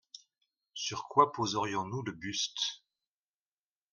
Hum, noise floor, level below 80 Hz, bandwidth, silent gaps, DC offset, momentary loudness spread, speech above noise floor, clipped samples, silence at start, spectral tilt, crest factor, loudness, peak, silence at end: none; under -90 dBFS; -74 dBFS; 10.5 kHz; none; under 0.1%; 22 LU; over 57 dB; under 0.1%; 0.15 s; -3.5 dB/octave; 26 dB; -33 LUFS; -10 dBFS; 1.15 s